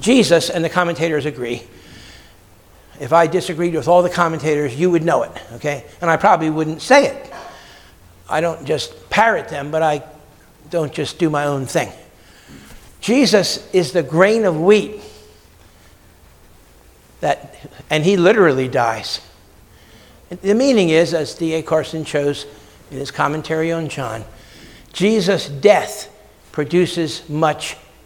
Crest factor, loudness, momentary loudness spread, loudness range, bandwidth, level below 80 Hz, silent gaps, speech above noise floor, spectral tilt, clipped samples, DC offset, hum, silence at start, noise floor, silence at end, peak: 18 dB; -17 LUFS; 15 LU; 5 LU; 18.5 kHz; -50 dBFS; none; 31 dB; -5 dB/octave; under 0.1%; under 0.1%; none; 0 s; -47 dBFS; 0.3 s; 0 dBFS